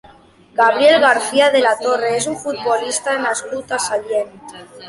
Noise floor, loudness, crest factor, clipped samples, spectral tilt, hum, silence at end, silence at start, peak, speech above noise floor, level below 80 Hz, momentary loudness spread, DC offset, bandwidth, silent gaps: -47 dBFS; -16 LUFS; 16 dB; under 0.1%; -2 dB/octave; none; 0 s; 0.55 s; 0 dBFS; 30 dB; -60 dBFS; 12 LU; under 0.1%; 11.5 kHz; none